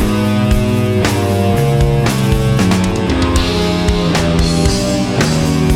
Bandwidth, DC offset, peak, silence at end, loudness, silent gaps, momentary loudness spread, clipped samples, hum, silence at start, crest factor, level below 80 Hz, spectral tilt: 17 kHz; under 0.1%; 0 dBFS; 0 s; -14 LUFS; none; 2 LU; under 0.1%; none; 0 s; 12 dB; -22 dBFS; -5.5 dB/octave